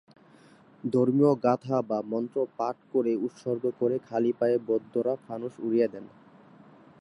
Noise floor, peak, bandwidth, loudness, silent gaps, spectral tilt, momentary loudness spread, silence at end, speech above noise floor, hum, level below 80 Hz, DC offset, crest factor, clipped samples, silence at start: -56 dBFS; -10 dBFS; 10.5 kHz; -28 LUFS; none; -9 dB/octave; 10 LU; 0.95 s; 29 dB; none; -78 dBFS; under 0.1%; 18 dB; under 0.1%; 0.85 s